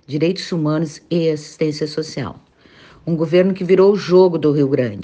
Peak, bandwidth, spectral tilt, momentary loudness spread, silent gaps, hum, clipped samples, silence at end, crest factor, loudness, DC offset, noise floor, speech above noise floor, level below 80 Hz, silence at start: -2 dBFS; 8.6 kHz; -7 dB/octave; 11 LU; none; none; under 0.1%; 0 s; 16 dB; -17 LUFS; under 0.1%; -46 dBFS; 30 dB; -58 dBFS; 0.1 s